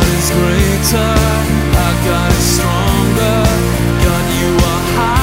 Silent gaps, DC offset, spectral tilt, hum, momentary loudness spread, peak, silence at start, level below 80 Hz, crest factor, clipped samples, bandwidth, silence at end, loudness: none; under 0.1%; -5 dB/octave; none; 2 LU; 0 dBFS; 0 s; -18 dBFS; 12 dB; under 0.1%; 16.5 kHz; 0 s; -13 LUFS